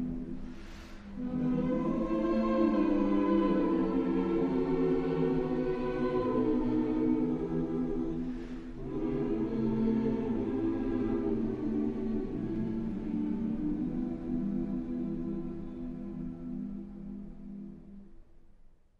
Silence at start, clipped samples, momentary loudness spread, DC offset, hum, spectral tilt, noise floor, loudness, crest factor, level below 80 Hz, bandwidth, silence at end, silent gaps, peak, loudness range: 0 s; under 0.1%; 14 LU; under 0.1%; none; -9.5 dB/octave; -56 dBFS; -32 LUFS; 16 dB; -46 dBFS; 6.8 kHz; 0.25 s; none; -16 dBFS; 8 LU